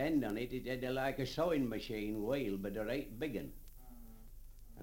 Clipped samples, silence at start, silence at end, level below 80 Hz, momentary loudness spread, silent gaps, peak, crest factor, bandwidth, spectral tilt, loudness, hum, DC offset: under 0.1%; 0 s; 0 s; -54 dBFS; 23 LU; none; -22 dBFS; 16 dB; 17 kHz; -6 dB/octave; -39 LUFS; none; under 0.1%